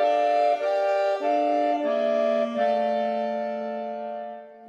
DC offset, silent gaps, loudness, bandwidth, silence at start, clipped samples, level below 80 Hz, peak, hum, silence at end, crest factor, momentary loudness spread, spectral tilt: under 0.1%; none; -24 LUFS; 8 kHz; 0 s; under 0.1%; -84 dBFS; -12 dBFS; none; 0 s; 12 dB; 10 LU; -5 dB/octave